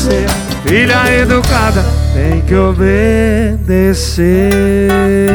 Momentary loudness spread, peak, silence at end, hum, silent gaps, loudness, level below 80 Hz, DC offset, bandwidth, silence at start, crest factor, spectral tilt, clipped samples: 4 LU; 0 dBFS; 0 s; none; none; -11 LUFS; -16 dBFS; under 0.1%; 20 kHz; 0 s; 10 dB; -6 dB/octave; under 0.1%